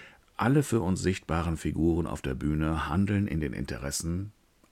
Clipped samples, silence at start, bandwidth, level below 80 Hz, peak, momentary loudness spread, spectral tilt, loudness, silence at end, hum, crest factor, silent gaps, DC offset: under 0.1%; 0 s; 16 kHz; -42 dBFS; -10 dBFS; 8 LU; -6 dB/octave; -29 LUFS; 0.4 s; none; 18 dB; none; under 0.1%